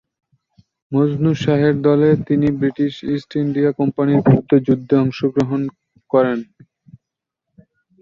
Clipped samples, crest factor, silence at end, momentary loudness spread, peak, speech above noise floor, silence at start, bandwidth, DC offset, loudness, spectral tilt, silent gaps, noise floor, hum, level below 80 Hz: under 0.1%; 16 dB; 1.55 s; 8 LU; -2 dBFS; 66 dB; 0.9 s; 7.2 kHz; under 0.1%; -17 LUFS; -9 dB/octave; none; -82 dBFS; none; -52 dBFS